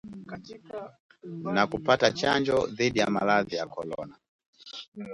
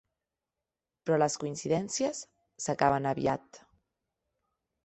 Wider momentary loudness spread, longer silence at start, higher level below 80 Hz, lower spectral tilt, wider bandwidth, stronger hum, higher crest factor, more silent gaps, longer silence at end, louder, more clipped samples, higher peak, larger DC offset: first, 19 LU vs 12 LU; second, 0.05 s vs 1.05 s; first, -60 dBFS vs -66 dBFS; about the same, -4.5 dB/octave vs -4.5 dB/octave; first, 11.5 kHz vs 8.6 kHz; neither; about the same, 22 dB vs 24 dB; first, 1.00-1.09 s, 4.28-4.39 s, 4.48-4.53 s, 4.88-4.92 s vs none; second, 0 s vs 1.3 s; first, -26 LUFS vs -31 LUFS; neither; about the same, -8 dBFS vs -10 dBFS; neither